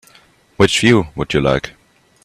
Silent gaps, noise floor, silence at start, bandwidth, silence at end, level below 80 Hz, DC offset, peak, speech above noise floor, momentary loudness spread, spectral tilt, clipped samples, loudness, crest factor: none; -50 dBFS; 0.6 s; 14 kHz; 0.55 s; -40 dBFS; under 0.1%; 0 dBFS; 35 dB; 9 LU; -5 dB/octave; under 0.1%; -15 LUFS; 18 dB